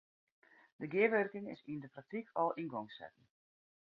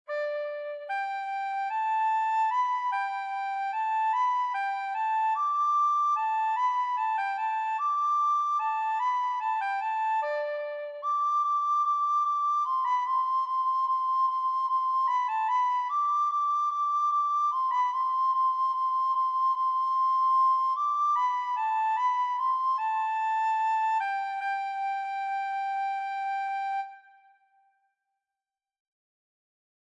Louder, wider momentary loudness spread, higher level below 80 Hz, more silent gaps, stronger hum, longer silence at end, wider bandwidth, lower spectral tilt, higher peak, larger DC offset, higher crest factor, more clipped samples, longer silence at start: second, -38 LUFS vs -27 LUFS; first, 18 LU vs 6 LU; first, -84 dBFS vs under -90 dBFS; neither; neither; second, 0.9 s vs 2.85 s; second, 5.4 kHz vs 7.6 kHz; first, -4.5 dB/octave vs 3.5 dB/octave; about the same, -18 dBFS vs -18 dBFS; neither; first, 22 dB vs 10 dB; neither; first, 0.8 s vs 0.1 s